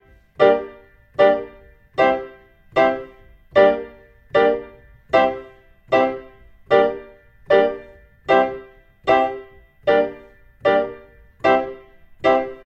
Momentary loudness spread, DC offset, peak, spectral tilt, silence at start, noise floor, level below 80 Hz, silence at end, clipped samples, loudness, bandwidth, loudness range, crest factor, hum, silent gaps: 18 LU; under 0.1%; 0 dBFS; -6 dB/octave; 0.4 s; -46 dBFS; -52 dBFS; 0.1 s; under 0.1%; -19 LUFS; 7.6 kHz; 1 LU; 20 dB; none; none